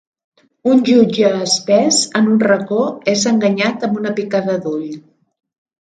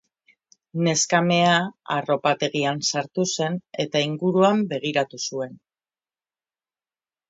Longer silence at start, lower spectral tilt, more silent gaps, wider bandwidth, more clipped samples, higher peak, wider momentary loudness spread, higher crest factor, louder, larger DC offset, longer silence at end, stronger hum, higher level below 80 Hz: about the same, 0.65 s vs 0.75 s; about the same, -4 dB/octave vs -4 dB/octave; neither; first, 9.4 kHz vs 8.2 kHz; neither; first, 0 dBFS vs -6 dBFS; about the same, 9 LU vs 10 LU; about the same, 16 dB vs 18 dB; first, -15 LUFS vs -22 LUFS; neither; second, 0.9 s vs 1.75 s; neither; first, -62 dBFS vs -70 dBFS